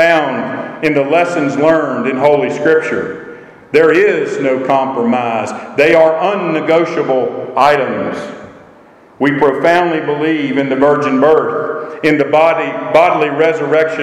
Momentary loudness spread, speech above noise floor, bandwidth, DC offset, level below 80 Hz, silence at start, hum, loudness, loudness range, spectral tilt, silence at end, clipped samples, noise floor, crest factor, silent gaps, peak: 9 LU; 30 dB; 11.5 kHz; under 0.1%; -56 dBFS; 0 s; none; -13 LUFS; 2 LU; -6 dB/octave; 0 s; under 0.1%; -42 dBFS; 12 dB; none; 0 dBFS